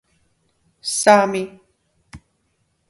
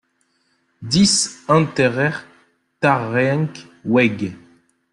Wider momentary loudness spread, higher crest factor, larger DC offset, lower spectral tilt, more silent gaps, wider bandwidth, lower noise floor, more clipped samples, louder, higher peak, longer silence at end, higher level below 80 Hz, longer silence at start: first, 17 LU vs 14 LU; about the same, 22 dB vs 18 dB; neither; second, -3 dB/octave vs -4.5 dB/octave; neither; about the same, 11.5 kHz vs 12 kHz; about the same, -68 dBFS vs -65 dBFS; neither; about the same, -17 LUFS vs -18 LUFS; about the same, 0 dBFS vs -2 dBFS; first, 0.75 s vs 0.55 s; second, -60 dBFS vs -54 dBFS; about the same, 0.85 s vs 0.8 s